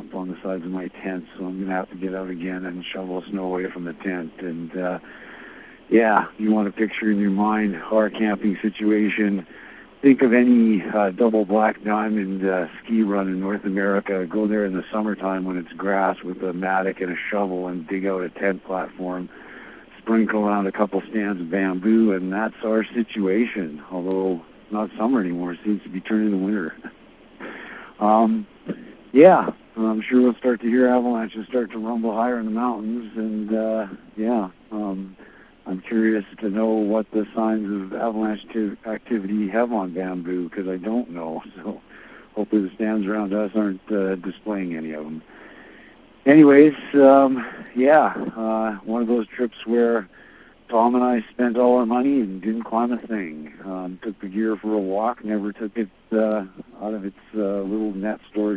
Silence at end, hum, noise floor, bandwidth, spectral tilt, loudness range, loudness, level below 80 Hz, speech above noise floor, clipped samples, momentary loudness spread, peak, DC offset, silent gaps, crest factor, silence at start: 0 s; none; -48 dBFS; 4 kHz; -11 dB/octave; 8 LU; -22 LUFS; -62 dBFS; 27 dB; under 0.1%; 14 LU; 0 dBFS; under 0.1%; none; 20 dB; 0 s